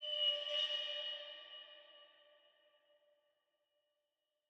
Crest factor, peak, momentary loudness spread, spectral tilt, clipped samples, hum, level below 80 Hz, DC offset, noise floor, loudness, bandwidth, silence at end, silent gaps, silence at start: 20 dB; -26 dBFS; 20 LU; 2 dB/octave; under 0.1%; none; under -90 dBFS; under 0.1%; -89 dBFS; -38 LUFS; 8.8 kHz; 2.4 s; none; 0 s